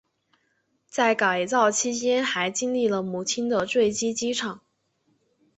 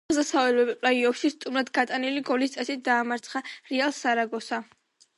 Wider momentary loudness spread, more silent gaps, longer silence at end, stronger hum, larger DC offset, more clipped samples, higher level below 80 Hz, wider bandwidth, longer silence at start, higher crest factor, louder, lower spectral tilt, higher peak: second, 6 LU vs 9 LU; neither; first, 1 s vs 0.55 s; neither; neither; neither; about the same, -68 dBFS vs -70 dBFS; second, 8.4 kHz vs 11.5 kHz; first, 0.95 s vs 0.1 s; about the same, 18 dB vs 18 dB; about the same, -24 LUFS vs -26 LUFS; about the same, -2.5 dB/octave vs -2.5 dB/octave; about the same, -6 dBFS vs -8 dBFS